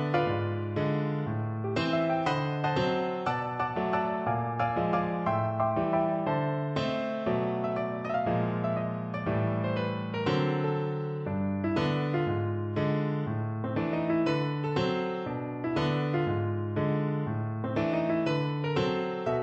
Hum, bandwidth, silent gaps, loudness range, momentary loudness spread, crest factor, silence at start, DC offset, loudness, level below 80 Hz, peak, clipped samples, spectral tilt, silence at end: none; 7.8 kHz; none; 1 LU; 4 LU; 16 dB; 0 s; under 0.1%; -30 LUFS; -58 dBFS; -14 dBFS; under 0.1%; -8 dB/octave; 0 s